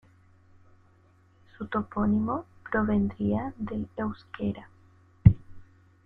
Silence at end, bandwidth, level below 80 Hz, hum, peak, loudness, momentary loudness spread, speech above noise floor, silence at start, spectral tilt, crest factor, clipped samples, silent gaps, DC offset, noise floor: 0.4 s; 4.6 kHz; -44 dBFS; none; -2 dBFS; -28 LUFS; 13 LU; 32 dB; 1.6 s; -11 dB/octave; 26 dB; under 0.1%; none; under 0.1%; -61 dBFS